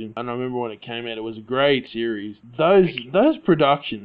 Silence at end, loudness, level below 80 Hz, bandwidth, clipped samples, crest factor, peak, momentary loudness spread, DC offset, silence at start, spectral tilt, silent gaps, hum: 0 s; -21 LUFS; -58 dBFS; 5 kHz; under 0.1%; 16 dB; -4 dBFS; 13 LU; under 0.1%; 0 s; -9.5 dB/octave; none; none